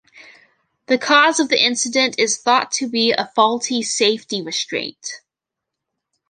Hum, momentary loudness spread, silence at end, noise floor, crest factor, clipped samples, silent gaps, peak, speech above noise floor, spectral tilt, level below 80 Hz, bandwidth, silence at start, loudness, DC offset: none; 11 LU; 1.15 s; -83 dBFS; 20 dB; under 0.1%; none; 0 dBFS; 65 dB; -1 dB/octave; -72 dBFS; 11 kHz; 0.15 s; -17 LUFS; under 0.1%